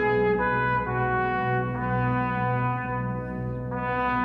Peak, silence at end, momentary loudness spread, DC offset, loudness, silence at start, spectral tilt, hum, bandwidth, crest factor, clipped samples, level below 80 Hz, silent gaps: -12 dBFS; 0 s; 8 LU; under 0.1%; -26 LUFS; 0 s; -9.5 dB/octave; none; 5.2 kHz; 14 dB; under 0.1%; -44 dBFS; none